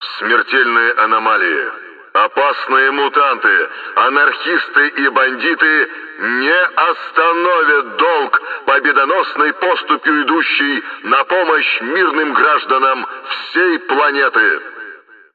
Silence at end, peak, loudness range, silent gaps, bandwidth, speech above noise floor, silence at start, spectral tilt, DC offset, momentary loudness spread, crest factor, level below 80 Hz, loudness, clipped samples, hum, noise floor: 0.4 s; 0 dBFS; 1 LU; none; 4.9 kHz; 23 dB; 0 s; -5 dB/octave; under 0.1%; 7 LU; 14 dB; -74 dBFS; -13 LUFS; under 0.1%; none; -37 dBFS